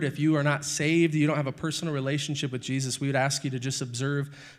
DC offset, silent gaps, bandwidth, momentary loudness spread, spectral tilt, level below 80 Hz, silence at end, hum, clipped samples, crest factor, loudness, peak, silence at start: under 0.1%; none; 14 kHz; 7 LU; -5 dB/octave; -68 dBFS; 0.05 s; none; under 0.1%; 18 dB; -27 LUFS; -10 dBFS; 0 s